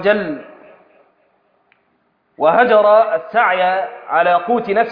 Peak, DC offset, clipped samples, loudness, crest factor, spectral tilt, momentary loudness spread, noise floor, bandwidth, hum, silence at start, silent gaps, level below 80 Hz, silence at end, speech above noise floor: 0 dBFS; under 0.1%; under 0.1%; -14 LUFS; 16 dB; -8 dB/octave; 9 LU; -62 dBFS; 5.2 kHz; none; 0 s; none; -62 dBFS; 0 s; 48 dB